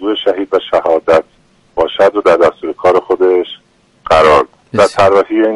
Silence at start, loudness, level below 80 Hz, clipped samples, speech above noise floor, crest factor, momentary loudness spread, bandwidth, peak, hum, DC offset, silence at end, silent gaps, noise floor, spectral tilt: 0 s; -11 LUFS; -42 dBFS; under 0.1%; 40 dB; 12 dB; 8 LU; 11.5 kHz; 0 dBFS; none; under 0.1%; 0 s; none; -50 dBFS; -5 dB/octave